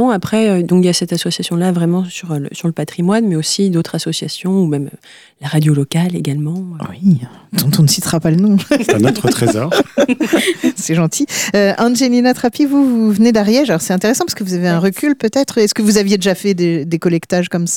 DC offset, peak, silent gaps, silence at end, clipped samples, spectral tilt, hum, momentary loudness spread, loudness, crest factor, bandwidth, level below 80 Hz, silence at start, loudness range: under 0.1%; -2 dBFS; none; 0 s; under 0.1%; -5 dB/octave; none; 7 LU; -14 LUFS; 12 dB; 17.5 kHz; -52 dBFS; 0 s; 4 LU